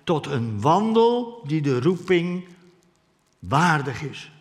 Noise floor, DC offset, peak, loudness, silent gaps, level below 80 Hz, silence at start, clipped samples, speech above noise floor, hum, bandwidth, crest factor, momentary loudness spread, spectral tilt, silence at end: -64 dBFS; under 0.1%; -4 dBFS; -22 LUFS; none; -62 dBFS; 0.05 s; under 0.1%; 43 dB; none; 12.5 kHz; 20 dB; 13 LU; -6.5 dB/octave; 0.1 s